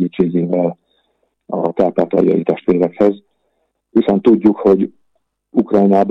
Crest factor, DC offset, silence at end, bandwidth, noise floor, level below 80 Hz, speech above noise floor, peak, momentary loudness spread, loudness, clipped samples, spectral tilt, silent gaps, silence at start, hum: 14 dB; under 0.1%; 0 s; 6 kHz; -67 dBFS; -54 dBFS; 53 dB; -2 dBFS; 9 LU; -15 LUFS; under 0.1%; -10 dB/octave; none; 0 s; none